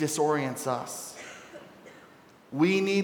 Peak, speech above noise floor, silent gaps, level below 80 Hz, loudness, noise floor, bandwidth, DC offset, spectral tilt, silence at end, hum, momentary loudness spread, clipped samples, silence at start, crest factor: -12 dBFS; 28 dB; none; -76 dBFS; -28 LUFS; -55 dBFS; 19 kHz; under 0.1%; -4.5 dB/octave; 0 s; none; 24 LU; under 0.1%; 0 s; 18 dB